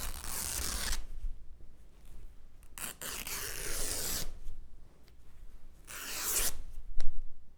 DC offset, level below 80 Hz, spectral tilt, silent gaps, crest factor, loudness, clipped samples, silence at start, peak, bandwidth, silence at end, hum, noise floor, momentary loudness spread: under 0.1%; -40 dBFS; -1 dB/octave; none; 20 dB; -36 LUFS; under 0.1%; 0 s; -10 dBFS; over 20 kHz; 0.05 s; none; -49 dBFS; 24 LU